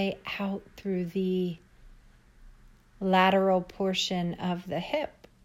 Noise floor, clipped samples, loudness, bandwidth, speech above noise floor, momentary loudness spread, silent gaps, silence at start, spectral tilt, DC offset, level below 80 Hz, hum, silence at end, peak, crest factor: -56 dBFS; under 0.1%; -29 LUFS; 14.5 kHz; 27 dB; 12 LU; none; 0 s; -5.5 dB/octave; under 0.1%; -58 dBFS; none; 0.35 s; -10 dBFS; 20 dB